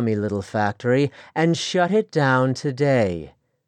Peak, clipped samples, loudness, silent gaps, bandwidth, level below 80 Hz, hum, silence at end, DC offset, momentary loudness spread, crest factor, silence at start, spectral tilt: -6 dBFS; under 0.1%; -21 LUFS; none; 9.8 kHz; -58 dBFS; none; 0.4 s; under 0.1%; 6 LU; 16 dB; 0 s; -6 dB/octave